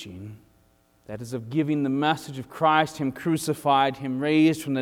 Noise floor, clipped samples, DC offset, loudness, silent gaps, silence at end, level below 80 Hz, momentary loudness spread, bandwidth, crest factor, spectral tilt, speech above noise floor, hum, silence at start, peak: -62 dBFS; under 0.1%; under 0.1%; -24 LUFS; none; 0 s; -64 dBFS; 18 LU; 16 kHz; 18 dB; -5.5 dB/octave; 38 dB; none; 0 s; -6 dBFS